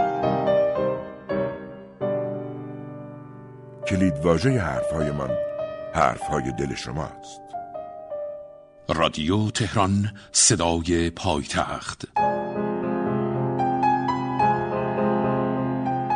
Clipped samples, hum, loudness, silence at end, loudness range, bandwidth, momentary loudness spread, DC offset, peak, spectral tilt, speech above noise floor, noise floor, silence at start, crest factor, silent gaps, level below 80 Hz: under 0.1%; none; -24 LUFS; 0 s; 6 LU; 11.5 kHz; 15 LU; under 0.1%; -4 dBFS; -4.5 dB/octave; 21 dB; -44 dBFS; 0 s; 20 dB; none; -46 dBFS